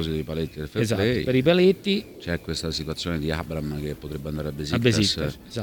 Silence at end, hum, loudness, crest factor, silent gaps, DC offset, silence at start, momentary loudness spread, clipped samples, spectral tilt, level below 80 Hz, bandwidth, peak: 0 s; none; -25 LUFS; 20 dB; none; under 0.1%; 0 s; 11 LU; under 0.1%; -5.5 dB/octave; -42 dBFS; 19 kHz; -6 dBFS